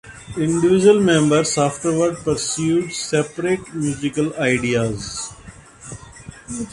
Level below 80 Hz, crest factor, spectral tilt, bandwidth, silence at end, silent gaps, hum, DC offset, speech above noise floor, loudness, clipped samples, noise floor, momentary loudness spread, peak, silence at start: -48 dBFS; 18 dB; -5 dB/octave; 11.5 kHz; 0 s; none; none; under 0.1%; 23 dB; -19 LUFS; under 0.1%; -41 dBFS; 21 LU; -2 dBFS; 0.05 s